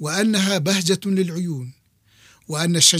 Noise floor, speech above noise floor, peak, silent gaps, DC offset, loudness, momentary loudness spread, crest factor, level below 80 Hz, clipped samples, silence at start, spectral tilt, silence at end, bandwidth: -56 dBFS; 37 dB; -2 dBFS; none; under 0.1%; -20 LUFS; 11 LU; 18 dB; -64 dBFS; under 0.1%; 0 s; -3.5 dB/octave; 0 s; 15.5 kHz